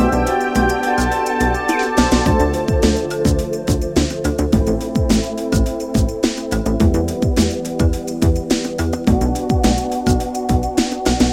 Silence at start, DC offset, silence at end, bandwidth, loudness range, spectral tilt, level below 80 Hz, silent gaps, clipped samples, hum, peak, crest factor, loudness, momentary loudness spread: 0 s; under 0.1%; 0 s; 17 kHz; 2 LU; -5.5 dB/octave; -24 dBFS; none; under 0.1%; none; -2 dBFS; 16 dB; -18 LUFS; 4 LU